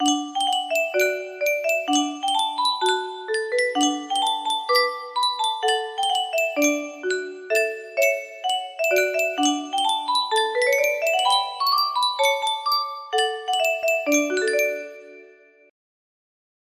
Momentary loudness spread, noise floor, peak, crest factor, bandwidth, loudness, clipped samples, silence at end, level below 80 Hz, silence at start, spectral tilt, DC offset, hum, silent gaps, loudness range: 6 LU; -51 dBFS; -6 dBFS; 16 dB; 16 kHz; -22 LUFS; under 0.1%; 1.4 s; -74 dBFS; 0 s; 0.5 dB/octave; under 0.1%; none; none; 2 LU